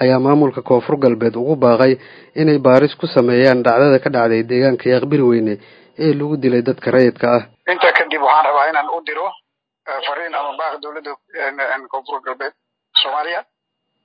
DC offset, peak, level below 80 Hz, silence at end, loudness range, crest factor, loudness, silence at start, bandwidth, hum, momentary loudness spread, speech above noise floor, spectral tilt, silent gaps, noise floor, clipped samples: under 0.1%; 0 dBFS; -64 dBFS; 0.65 s; 10 LU; 16 dB; -15 LUFS; 0 s; 5.8 kHz; none; 14 LU; 59 dB; -8 dB/octave; none; -74 dBFS; under 0.1%